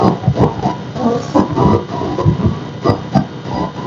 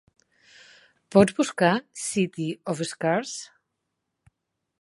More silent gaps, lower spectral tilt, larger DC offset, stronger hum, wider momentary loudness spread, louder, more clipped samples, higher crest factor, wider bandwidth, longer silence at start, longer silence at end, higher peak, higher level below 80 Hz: neither; first, -8 dB/octave vs -5 dB/octave; neither; neither; second, 7 LU vs 13 LU; first, -16 LUFS vs -24 LUFS; neither; second, 14 dB vs 24 dB; second, 7.4 kHz vs 11.5 kHz; second, 0 s vs 1.1 s; second, 0 s vs 1.4 s; first, 0 dBFS vs -4 dBFS; first, -34 dBFS vs -66 dBFS